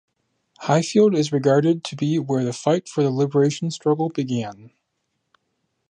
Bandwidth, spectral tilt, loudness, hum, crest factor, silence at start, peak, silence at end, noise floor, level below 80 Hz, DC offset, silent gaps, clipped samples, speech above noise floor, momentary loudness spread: 10 kHz; -6.5 dB/octave; -21 LUFS; none; 18 dB; 0.6 s; -4 dBFS; 1.25 s; -75 dBFS; -70 dBFS; under 0.1%; none; under 0.1%; 55 dB; 8 LU